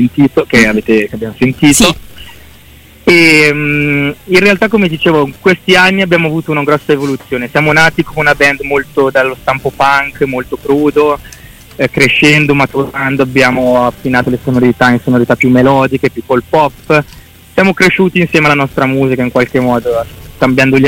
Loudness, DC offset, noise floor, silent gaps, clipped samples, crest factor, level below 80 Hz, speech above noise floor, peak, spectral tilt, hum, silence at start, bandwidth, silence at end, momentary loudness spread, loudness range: -9 LUFS; under 0.1%; -38 dBFS; none; 0.3%; 10 dB; -36 dBFS; 28 dB; 0 dBFS; -5 dB/octave; none; 0 s; 17 kHz; 0 s; 8 LU; 2 LU